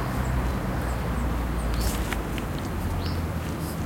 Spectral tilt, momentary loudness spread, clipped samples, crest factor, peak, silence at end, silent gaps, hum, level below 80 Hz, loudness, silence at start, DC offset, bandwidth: -6 dB/octave; 3 LU; under 0.1%; 16 dB; -10 dBFS; 0 s; none; none; -30 dBFS; -29 LUFS; 0 s; under 0.1%; 17 kHz